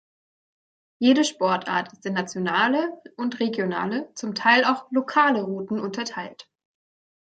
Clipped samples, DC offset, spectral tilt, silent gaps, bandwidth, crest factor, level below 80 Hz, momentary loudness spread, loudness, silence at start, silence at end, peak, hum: under 0.1%; under 0.1%; -4.5 dB/octave; none; 9.2 kHz; 20 dB; -74 dBFS; 12 LU; -23 LUFS; 1 s; 0.8 s; -4 dBFS; none